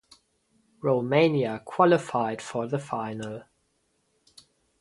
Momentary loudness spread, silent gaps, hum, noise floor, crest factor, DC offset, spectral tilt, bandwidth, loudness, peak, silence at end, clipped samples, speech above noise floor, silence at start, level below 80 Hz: 13 LU; none; none; -72 dBFS; 22 dB; under 0.1%; -6.5 dB/octave; 11.5 kHz; -26 LUFS; -6 dBFS; 1.4 s; under 0.1%; 47 dB; 0.85 s; -70 dBFS